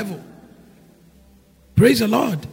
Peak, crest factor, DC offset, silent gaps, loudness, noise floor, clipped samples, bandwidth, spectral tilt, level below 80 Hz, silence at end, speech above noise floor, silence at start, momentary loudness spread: -2 dBFS; 20 dB; under 0.1%; none; -18 LUFS; -52 dBFS; under 0.1%; 16 kHz; -6 dB/octave; -48 dBFS; 0 s; 33 dB; 0 s; 17 LU